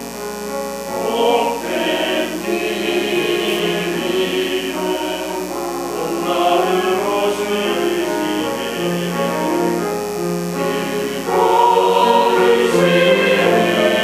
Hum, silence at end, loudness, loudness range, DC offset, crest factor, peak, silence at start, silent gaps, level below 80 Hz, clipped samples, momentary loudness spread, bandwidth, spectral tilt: none; 0 s; -17 LUFS; 5 LU; under 0.1%; 16 dB; 0 dBFS; 0 s; none; -50 dBFS; under 0.1%; 10 LU; 16 kHz; -4 dB/octave